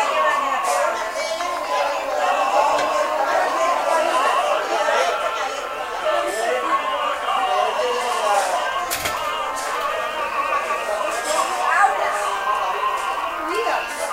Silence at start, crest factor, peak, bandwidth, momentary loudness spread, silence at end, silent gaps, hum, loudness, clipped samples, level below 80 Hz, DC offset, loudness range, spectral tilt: 0 s; 16 dB; -4 dBFS; 16 kHz; 6 LU; 0 s; none; none; -21 LUFS; under 0.1%; -56 dBFS; under 0.1%; 2 LU; -1 dB/octave